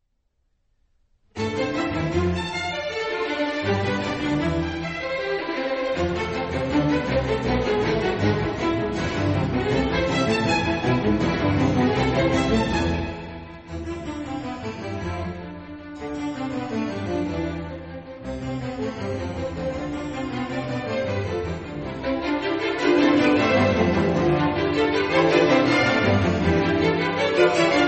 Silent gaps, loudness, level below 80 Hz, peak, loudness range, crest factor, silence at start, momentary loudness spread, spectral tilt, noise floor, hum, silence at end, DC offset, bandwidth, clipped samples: none; -23 LUFS; -40 dBFS; -4 dBFS; 10 LU; 18 dB; 1.35 s; 13 LU; -6 dB/octave; -70 dBFS; none; 0 s; under 0.1%; 8.4 kHz; under 0.1%